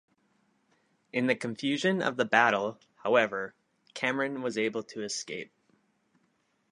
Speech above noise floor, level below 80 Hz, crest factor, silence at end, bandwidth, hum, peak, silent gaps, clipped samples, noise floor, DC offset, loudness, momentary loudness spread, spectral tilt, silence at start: 44 dB; -80 dBFS; 24 dB; 1.25 s; 11 kHz; none; -6 dBFS; none; under 0.1%; -73 dBFS; under 0.1%; -29 LUFS; 14 LU; -4 dB/octave; 1.15 s